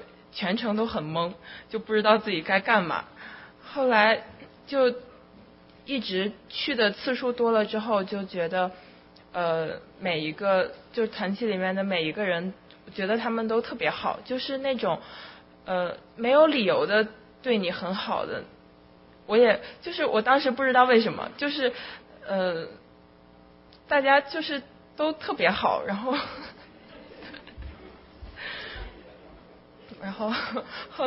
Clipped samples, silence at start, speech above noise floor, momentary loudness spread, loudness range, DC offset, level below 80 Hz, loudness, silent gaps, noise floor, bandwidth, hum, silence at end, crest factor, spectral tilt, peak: under 0.1%; 0 s; 28 dB; 21 LU; 6 LU; under 0.1%; -58 dBFS; -26 LUFS; none; -54 dBFS; 5.8 kHz; none; 0 s; 22 dB; -9 dB/octave; -6 dBFS